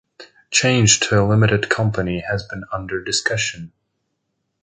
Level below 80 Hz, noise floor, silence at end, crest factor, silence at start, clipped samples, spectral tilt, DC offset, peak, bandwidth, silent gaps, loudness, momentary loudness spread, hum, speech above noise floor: -44 dBFS; -74 dBFS; 0.95 s; 18 dB; 0.2 s; under 0.1%; -3.5 dB/octave; under 0.1%; 0 dBFS; 9.6 kHz; none; -18 LUFS; 12 LU; none; 55 dB